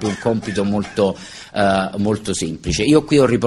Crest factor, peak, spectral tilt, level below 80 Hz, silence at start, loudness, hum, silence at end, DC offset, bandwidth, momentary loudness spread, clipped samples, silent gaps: 16 dB; -2 dBFS; -5.5 dB/octave; -40 dBFS; 0 s; -18 LUFS; none; 0 s; under 0.1%; 12 kHz; 8 LU; under 0.1%; none